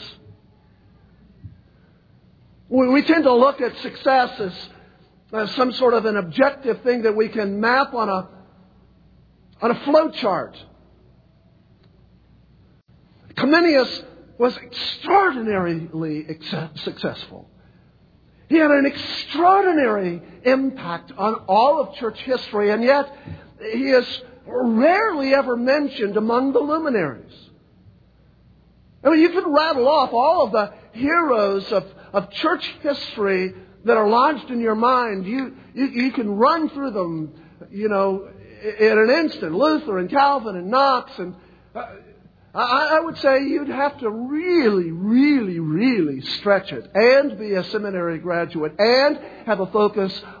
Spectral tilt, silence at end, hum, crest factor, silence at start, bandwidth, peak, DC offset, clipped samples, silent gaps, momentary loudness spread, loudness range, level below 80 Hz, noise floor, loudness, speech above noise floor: -7 dB/octave; 0 s; none; 20 dB; 0 s; 5 kHz; -2 dBFS; under 0.1%; under 0.1%; none; 13 LU; 4 LU; -58 dBFS; -54 dBFS; -20 LUFS; 35 dB